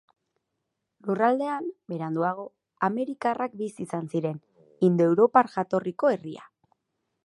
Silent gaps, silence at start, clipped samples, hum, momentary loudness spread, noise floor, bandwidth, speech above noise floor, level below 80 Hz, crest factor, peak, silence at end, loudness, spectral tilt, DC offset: none; 1.05 s; under 0.1%; none; 15 LU; -81 dBFS; 11.5 kHz; 56 dB; -78 dBFS; 22 dB; -4 dBFS; 0.85 s; -26 LUFS; -8 dB/octave; under 0.1%